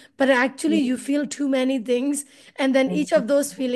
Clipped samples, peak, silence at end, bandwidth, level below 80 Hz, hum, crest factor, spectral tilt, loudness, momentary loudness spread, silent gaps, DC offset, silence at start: under 0.1%; -6 dBFS; 0 s; 12.5 kHz; -70 dBFS; none; 16 dB; -4 dB/octave; -22 LUFS; 6 LU; none; under 0.1%; 0.2 s